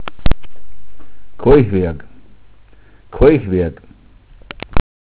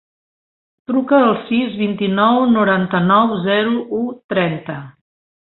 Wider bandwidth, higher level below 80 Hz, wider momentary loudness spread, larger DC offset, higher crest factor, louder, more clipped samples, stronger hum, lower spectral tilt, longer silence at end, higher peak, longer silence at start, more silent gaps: about the same, 4 kHz vs 4.2 kHz; first, -26 dBFS vs -58 dBFS; first, 21 LU vs 10 LU; neither; about the same, 16 dB vs 16 dB; about the same, -15 LUFS vs -16 LUFS; neither; neither; about the same, -11.5 dB/octave vs -11.5 dB/octave; second, 0.2 s vs 0.55 s; about the same, 0 dBFS vs -2 dBFS; second, 0 s vs 0.9 s; second, none vs 4.24-4.29 s